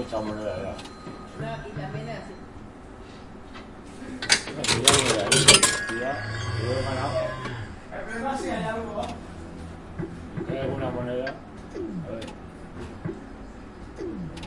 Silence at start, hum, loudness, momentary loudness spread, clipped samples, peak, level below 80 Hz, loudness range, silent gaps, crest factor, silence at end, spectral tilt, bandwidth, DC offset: 0 s; none; -24 LUFS; 24 LU; under 0.1%; 0 dBFS; -48 dBFS; 16 LU; none; 28 dB; 0 s; -2.5 dB/octave; 11.5 kHz; under 0.1%